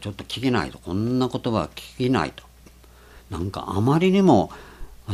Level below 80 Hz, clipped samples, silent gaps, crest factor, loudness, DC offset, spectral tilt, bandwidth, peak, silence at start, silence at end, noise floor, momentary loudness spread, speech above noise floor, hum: -46 dBFS; under 0.1%; none; 20 dB; -23 LUFS; under 0.1%; -7 dB/octave; 14 kHz; -4 dBFS; 0 s; 0 s; -49 dBFS; 14 LU; 27 dB; none